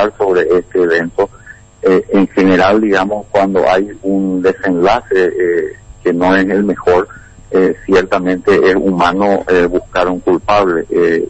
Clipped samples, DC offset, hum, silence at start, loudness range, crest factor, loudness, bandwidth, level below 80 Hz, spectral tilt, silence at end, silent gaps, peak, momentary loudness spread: under 0.1%; under 0.1%; none; 0 s; 1 LU; 10 dB; -12 LUFS; 8.4 kHz; -40 dBFS; -6.5 dB/octave; 0 s; none; -2 dBFS; 6 LU